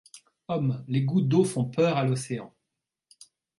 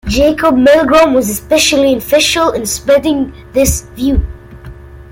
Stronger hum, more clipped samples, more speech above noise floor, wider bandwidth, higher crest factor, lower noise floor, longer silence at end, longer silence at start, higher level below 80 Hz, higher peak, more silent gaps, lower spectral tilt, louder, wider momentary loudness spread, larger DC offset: neither; neither; first, 59 dB vs 21 dB; second, 11.5 kHz vs 17 kHz; first, 18 dB vs 12 dB; first, -85 dBFS vs -31 dBFS; first, 1.1 s vs 0.1 s; about the same, 0.15 s vs 0.05 s; second, -68 dBFS vs -26 dBFS; second, -10 dBFS vs 0 dBFS; neither; first, -7 dB/octave vs -4 dB/octave; second, -26 LUFS vs -11 LUFS; first, 11 LU vs 8 LU; neither